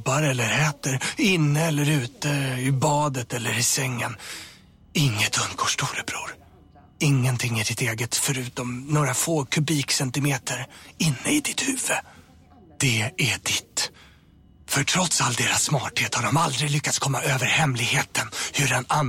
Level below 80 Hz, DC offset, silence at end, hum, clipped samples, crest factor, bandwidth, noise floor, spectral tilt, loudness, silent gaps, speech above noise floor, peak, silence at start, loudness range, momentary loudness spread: -56 dBFS; under 0.1%; 0 s; none; under 0.1%; 16 dB; 16.5 kHz; -53 dBFS; -3.5 dB/octave; -23 LUFS; none; 30 dB; -8 dBFS; 0 s; 3 LU; 8 LU